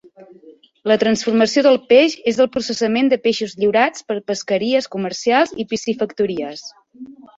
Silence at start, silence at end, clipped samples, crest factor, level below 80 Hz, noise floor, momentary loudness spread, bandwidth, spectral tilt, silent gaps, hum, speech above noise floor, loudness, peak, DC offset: 0.2 s; 0.25 s; under 0.1%; 16 dB; -60 dBFS; -47 dBFS; 11 LU; 8 kHz; -4 dB/octave; none; none; 30 dB; -17 LUFS; -2 dBFS; under 0.1%